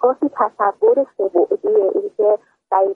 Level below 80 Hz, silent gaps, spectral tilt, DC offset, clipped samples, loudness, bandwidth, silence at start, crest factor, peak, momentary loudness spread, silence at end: -70 dBFS; none; -8.5 dB/octave; under 0.1%; under 0.1%; -18 LUFS; 2.9 kHz; 0 s; 14 dB; -2 dBFS; 4 LU; 0 s